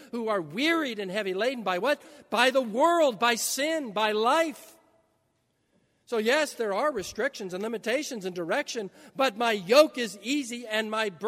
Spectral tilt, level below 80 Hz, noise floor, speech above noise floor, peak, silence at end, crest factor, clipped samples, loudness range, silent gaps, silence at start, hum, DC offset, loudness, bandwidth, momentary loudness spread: -3 dB/octave; -72 dBFS; -73 dBFS; 46 dB; -6 dBFS; 0 s; 22 dB; under 0.1%; 5 LU; none; 0 s; none; under 0.1%; -27 LUFS; 16 kHz; 10 LU